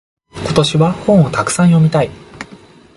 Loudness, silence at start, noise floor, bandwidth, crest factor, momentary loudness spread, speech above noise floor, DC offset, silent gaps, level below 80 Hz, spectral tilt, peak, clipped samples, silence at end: -13 LUFS; 0.35 s; -40 dBFS; 11.5 kHz; 14 dB; 21 LU; 29 dB; under 0.1%; none; -42 dBFS; -6 dB/octave; 0 dBFS; under 0.1%; 0.55 s